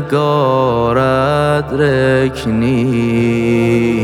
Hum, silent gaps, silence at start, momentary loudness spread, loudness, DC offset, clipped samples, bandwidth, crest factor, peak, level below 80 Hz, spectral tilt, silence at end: none; none; 0 s; 2 LU; -13 LUFS; under 0.1%; under 0.1%; 16 kHz; 12 dB; 0 dBFS; -36 dBFS; -7.5 dB/octave; 0 s